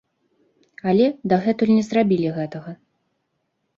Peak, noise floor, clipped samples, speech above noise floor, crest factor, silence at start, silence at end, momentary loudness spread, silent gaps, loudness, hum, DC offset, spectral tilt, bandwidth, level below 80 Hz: -6 dBFS; -73 dBFS; under 0.1%; 54 dB; 16 dB; 0.85 s; 1.05 s; 12 LU; none; -20 LUFS; none; under 0.1%; -7.5 dB/octave; 7.4 kHz; -64 dBFS